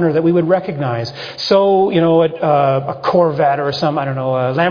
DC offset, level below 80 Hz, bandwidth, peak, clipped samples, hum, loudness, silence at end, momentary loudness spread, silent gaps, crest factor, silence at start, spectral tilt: under 0.1%; -56 dBFS; 5.2 kHz; -2 dBFS; under 0.1%; none; -15 LUFS; 0 s; 8 LU; none; 14 dB; 0 s; -7.5 dB/octave